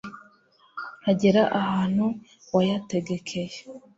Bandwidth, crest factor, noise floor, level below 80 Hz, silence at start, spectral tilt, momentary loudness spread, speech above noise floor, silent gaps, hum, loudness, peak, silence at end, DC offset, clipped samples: 8 kHz; 18 dB; -60 dBFS; -62 dBFS; 0.05 s; -6.5 dB/octave; 18 LU; 36 dB; none; none; -25 LUFS; -8 dBFS; 0.2 s; under 0.1%; under 0.1%